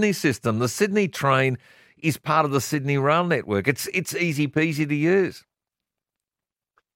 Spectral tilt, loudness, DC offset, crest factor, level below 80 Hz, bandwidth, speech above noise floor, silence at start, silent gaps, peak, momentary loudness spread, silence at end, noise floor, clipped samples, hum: -5.5 dB/octave; -23 LUFS; under 0.1%; 20 dB; -64 dBFS; 16.5 kHz; over 68 dB; 0 s; none; -4 dBFS; 5 LU; 1.55 s; under -90 dBFS; under 0.1%; none